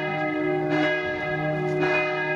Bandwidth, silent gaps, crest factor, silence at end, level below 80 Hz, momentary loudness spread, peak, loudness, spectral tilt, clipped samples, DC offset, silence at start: 7.6 kHz; none; 14 dB; 0 s; -58 dBFS; 4 LU; -10 dBFS; -24 LUFS; -7 dB/octave; under 0.1%; under 0.1%; 0 s